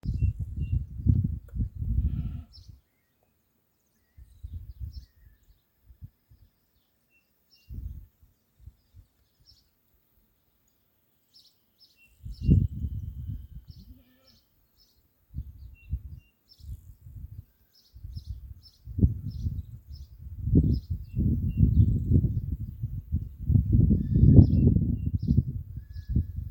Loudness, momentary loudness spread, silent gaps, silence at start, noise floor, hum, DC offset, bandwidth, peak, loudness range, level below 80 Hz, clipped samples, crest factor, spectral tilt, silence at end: -27 LUFS; 24 LU; none; 0.05 s; -72 dBFS; none; under 0.1%; 16.5 kHz; -2 dBFS; 27 LU; -34 dBFS; under 0.1%; 28 dB; -11.5 dB/octave; 0 s